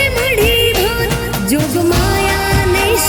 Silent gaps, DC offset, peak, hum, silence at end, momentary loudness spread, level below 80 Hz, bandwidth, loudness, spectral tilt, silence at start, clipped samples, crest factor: none; under 0.1%; -2 dBFS; none; 0 s; 5 LU; -24 dBFS; 19.5 kHz; -13 LUFS; -4 dB/octave; 0 s; under 0.1%; 12 dB